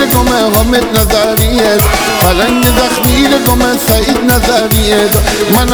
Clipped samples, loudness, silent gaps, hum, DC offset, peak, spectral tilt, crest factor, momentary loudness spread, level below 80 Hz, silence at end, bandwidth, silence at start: 0.2%; -9 LUFS; none; none; 0.2%; 0 dBFS; -4 dB/octave; 8 dB; 1 LU; -18 dBFS; 0 s; over 20 kHz; 0 s